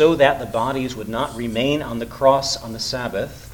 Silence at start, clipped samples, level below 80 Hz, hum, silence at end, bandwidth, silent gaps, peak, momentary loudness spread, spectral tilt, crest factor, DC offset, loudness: 0 s; under 0.1%; -44 dBFS; none; 0 s; 19 kHz; none; 0 dBFS; 9 LU; -4.5 dB/octave; 20 dB; under 0.1%; -21 LUFS